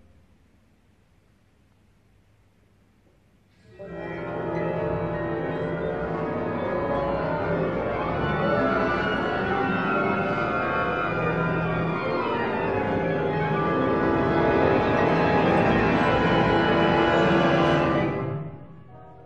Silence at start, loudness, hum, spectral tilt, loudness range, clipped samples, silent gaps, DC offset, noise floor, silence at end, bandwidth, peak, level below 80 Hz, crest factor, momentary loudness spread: 3.75 s; -24 LUFS; none; -7.5 dB/octave; 10 LU; under 0.1%; none; 0.2%; -61 dBFS; 0 s; 8.2 kHz; -8 dBFS; -46 dBFS; 18 dB; 8 LU